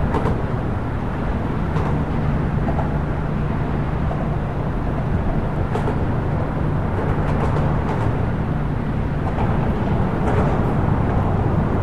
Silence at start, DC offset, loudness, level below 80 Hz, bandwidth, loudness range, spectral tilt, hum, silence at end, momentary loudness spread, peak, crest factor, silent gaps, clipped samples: 0 s; 2%; -22 LUFS; -26 dBFS; 8.8 kHz; 2 LU; -9 dB/octave; none; 0 s; 4 LU; -6 dBFS; 14 dB; none; under 0.1%